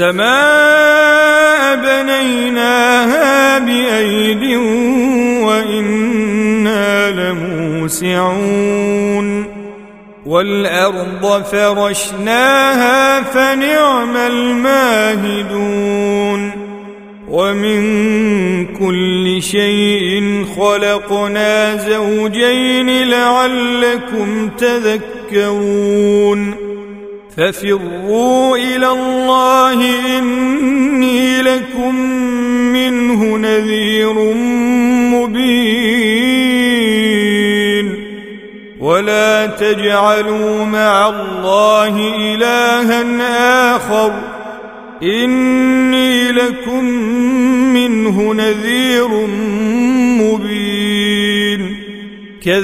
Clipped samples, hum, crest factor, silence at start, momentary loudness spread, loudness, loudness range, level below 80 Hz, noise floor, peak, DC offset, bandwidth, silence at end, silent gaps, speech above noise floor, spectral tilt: under 0.1%; none; 12 dB; 0 s; 7 LU; -12 LUFS; 4 LU; -46 dBFS; -35 dBFS; 0 dBFS; under 0.1%; 16 kHz; 0 s; none; 23 dB; -4 dB/octave